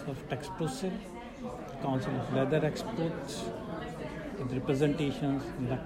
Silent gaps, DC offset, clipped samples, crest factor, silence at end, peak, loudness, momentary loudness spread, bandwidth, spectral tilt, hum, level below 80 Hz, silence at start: none; under 0.1%; under 0.1%; 18 dB; 0 s; -14 dBFS; -34 LUFS; 11 LU; 16 kHz; -6.5 dB/octave; none; -54 dBFS; 0 s